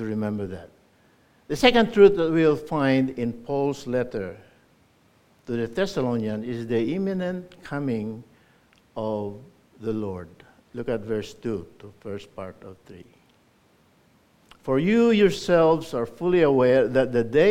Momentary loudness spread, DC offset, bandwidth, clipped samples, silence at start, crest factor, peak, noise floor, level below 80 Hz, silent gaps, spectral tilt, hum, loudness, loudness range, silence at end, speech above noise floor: 19 LU; under 0.1%; 15 kHz; under 0.1%; 0 s; 22 dB; -2 dBFS; -61 dBFS; -52 dBFS; none; -6.5 dB/octave; none; -23 LUFS; 13 LU; 0 s; 38 dB